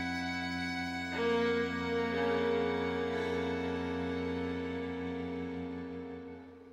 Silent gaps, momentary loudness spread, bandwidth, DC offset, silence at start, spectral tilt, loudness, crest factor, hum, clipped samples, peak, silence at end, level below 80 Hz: none; 10 LU; 12 kHz; under 0.1%; 0 s; -6 dB/octave; -35 LUFS; 14 dB; none; under 0.1%; -20 dBFS; 0 s; -60 dBFS